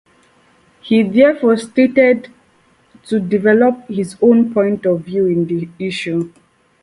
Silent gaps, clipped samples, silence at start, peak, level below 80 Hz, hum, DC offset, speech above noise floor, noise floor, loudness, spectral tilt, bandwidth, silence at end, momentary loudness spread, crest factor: none; under 0.1%; 0.85 s; 0 dBFS; -58 dBFS; none; under 0.1%; 40 dB; -54 dBFS; -15 LUFS; -7 dB/octave; 11.5 kHz; 0.55 s; 10 LU; 16 dB